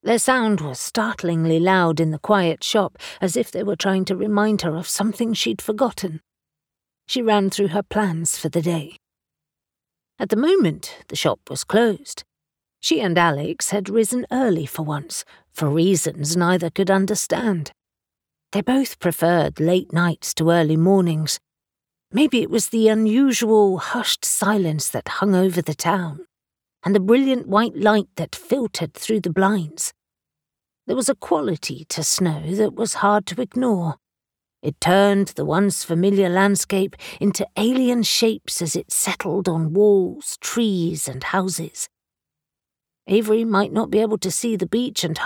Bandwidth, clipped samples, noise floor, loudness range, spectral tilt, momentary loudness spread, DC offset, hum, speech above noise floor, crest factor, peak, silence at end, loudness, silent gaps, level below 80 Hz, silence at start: over 20 kHz; under 0.1%; -87 dBFS; 4 LU; -4.5 dB/octave; 10 LU; under 0.1%; none; 68 dB; 18 dB; -2 dBFS; 0 s; -20 LUFS; none; -58 dBFS; 0.05 s